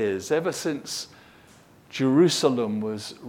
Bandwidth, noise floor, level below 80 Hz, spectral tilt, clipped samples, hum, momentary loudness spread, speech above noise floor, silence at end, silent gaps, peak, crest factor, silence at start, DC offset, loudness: 17 kHz; -53 dBFS; -68 dBFS; -5 dB/octave; under 0.1%; none; 14 LU; 29 dB; 0 s; none; -6 dBFS; 18 dB; 0 s; under 0.1%; -24 LUFS